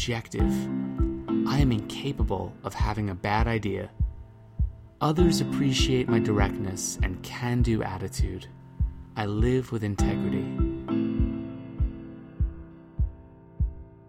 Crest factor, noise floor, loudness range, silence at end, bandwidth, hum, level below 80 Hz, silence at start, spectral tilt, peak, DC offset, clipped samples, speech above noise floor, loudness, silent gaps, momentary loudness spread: 18 dB; -48 dBFS; 4 LU; 0.15 s; 15.5 kHz; none; -34 dBFS; 0 s; -6 dB/octave; -10 dBFS; under 0.1%; under 0.1%; 22 dB; -28 LUFS; none; 9 LU